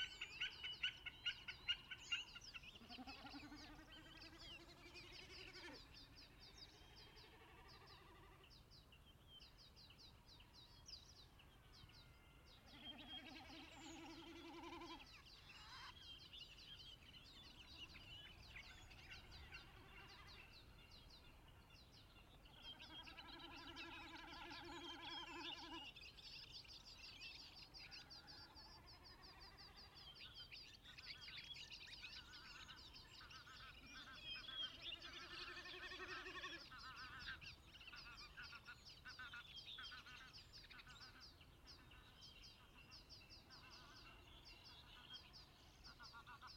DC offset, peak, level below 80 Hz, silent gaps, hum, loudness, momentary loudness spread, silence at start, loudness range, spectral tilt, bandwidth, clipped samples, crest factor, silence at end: under 0.1%; -32 dBFS; -70 dBFS; none; none; -56 LUFS; 15 LU; 0 s; 11 LU; -2.5 dB/octave; 16 kHz; under 0.1%; 26 dB; 0 s